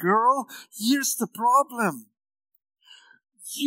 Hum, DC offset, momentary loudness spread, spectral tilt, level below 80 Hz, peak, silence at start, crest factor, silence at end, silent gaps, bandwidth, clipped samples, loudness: none; under 0.1%; 17 LU; -3 dB/octave; under -90 dBFS; -8 dBFS; 0 s; 18 dB; 0 s; none; 16 kHz; under 0.1%; -23 LUFS